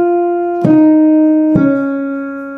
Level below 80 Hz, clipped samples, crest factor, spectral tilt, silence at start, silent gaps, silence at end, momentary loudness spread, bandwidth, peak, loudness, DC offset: -48 dBFS; under 0.1%; 10 dB; -11 dB/octave; 0 s; none; 0 s; 10 LU; 3 kHz; 0 dBFS; -11 LUFS; under 0.1%